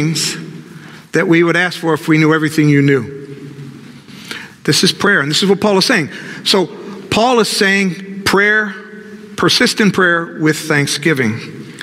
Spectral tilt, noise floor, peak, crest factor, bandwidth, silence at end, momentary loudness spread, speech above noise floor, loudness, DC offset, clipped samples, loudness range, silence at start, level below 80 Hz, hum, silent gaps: -4 dB/octave; -35 dBFS; 0 dBFS; 14 dB; 16 kHz; 0 s; 19 LU; 22 dB; -13 LUFS; under 0.1%; under 0.1%; 2 LU; 0 s; -54 dBFS; none; none